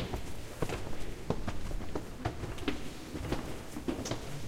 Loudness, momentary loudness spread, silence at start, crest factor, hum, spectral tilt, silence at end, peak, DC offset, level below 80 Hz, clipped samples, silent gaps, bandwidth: -40 LUFS; 5 LU; 0 s; 18 dB; none; -5.5 dB/octave; 0 s; -18 dBFS; under 0.1%; -44 dBFS; under 0.1%; none; 16 kHz